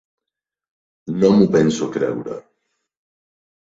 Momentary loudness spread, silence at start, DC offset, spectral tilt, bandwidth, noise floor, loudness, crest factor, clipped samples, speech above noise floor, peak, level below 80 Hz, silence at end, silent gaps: 19 LU; 1.05 s; under 0.1%; -7 dB/octave; 7.8 kHz; -85 dBFS; -17 LUFS; 18 dB; under 0.1%; 69 dB; -2 dBFS; -58 dBFS; 1.25 s; none